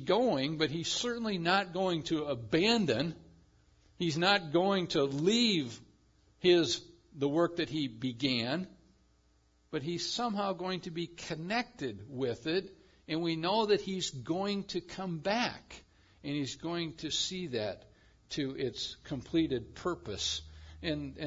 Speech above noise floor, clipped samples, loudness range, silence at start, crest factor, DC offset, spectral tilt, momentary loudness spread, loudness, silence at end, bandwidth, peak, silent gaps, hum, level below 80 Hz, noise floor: 36 dB; under 0.1%; 6 LU; 0 s; 20 dB; under 0.1%; -4.5 dB/octave; 12 LU; -33 LUFS; 0 s; 7.8 kHz; -14 dBFS; none; none; -62 dBFS; -69 dBFS